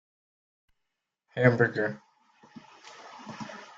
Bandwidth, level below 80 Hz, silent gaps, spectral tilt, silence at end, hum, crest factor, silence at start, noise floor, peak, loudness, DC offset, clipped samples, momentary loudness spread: 7.6 kHz; -68 dBFS; none; -7.5 dB/octave; 0.15 s; none; 24 dB; 1.35 s; -83 dBFS; -8 dBFS; -26 LUFS; under 0.1%; under 0.1%; 25 LU